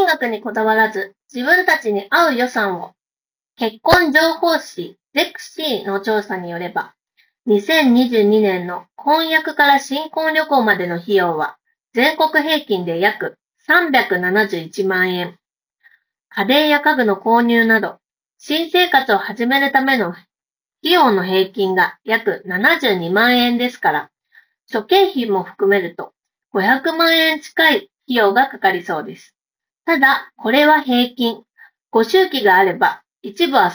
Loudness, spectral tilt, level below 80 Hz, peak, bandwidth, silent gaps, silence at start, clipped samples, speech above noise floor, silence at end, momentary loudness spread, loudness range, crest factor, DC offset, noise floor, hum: -16 LUFS; -4.5 dB/octave; -54 dBFS; 0 dBFS; over 20 kHz; none; 0 s; under 0.1%; over 74 dB; 0 s; 12 LU; 3 LU; 16 dB; under 0.1%; under -90 dBFS; none